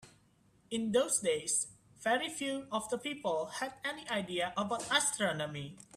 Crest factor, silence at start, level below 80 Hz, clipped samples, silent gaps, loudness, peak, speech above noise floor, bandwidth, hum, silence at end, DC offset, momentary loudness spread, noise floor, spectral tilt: 22 dB; 0 s; -72 dBFS; under 0.1%; none; -34 LUFS; -14 dBFS; 33 dB; 15.5 kHz; none; 0.15 s; under 0.1%; 9 LU; -68 dBFS; -2.5 dB/octave